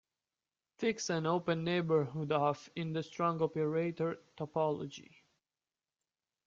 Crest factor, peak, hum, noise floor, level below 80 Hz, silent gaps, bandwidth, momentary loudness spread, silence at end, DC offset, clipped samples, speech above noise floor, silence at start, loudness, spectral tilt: 18 dB; -18 dBFS; none; under -90 dBFS; -76 dBFS; none; 7.6 kHz; 7 LU; 1.45 s; under 0.1%; under 0.1%; over 55 dB; 0.8 s; -35 LUFS; -6 dB/octave